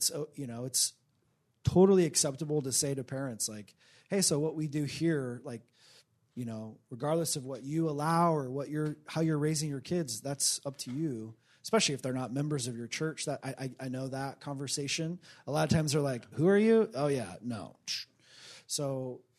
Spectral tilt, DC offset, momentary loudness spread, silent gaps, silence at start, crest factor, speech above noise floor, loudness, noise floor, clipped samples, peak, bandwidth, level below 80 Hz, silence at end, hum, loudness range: -4.5 dB/octave; under 0.1%; 13 LU; none; 0 s; 20 dB; 42 dB; -32 LUFS; -74 dBFS; under 0.1%; -12 dBFS; 13.5 kHz; -66 dBFS; 0.2 s; none; 6 LU